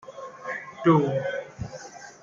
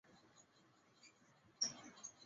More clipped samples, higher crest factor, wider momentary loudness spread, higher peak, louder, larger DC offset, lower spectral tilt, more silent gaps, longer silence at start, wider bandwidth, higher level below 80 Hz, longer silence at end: neither; second, 20 dB vs 28 dB; second, 20 LU vs 25 LU; first, -8 dBFS vs -24 dBFS; first, -25 LUFS vs -45 LUFS; neither; first, -7.5 dB/octave vs -0.5 dB/octave; neither; about the same, 0.05 s vs 0.05 s; about the same, 7.4 kHz vs 7.6 kHz; first, -58 dBFS vs under -90 dBFS; about the same, 0.1 s vs 0 s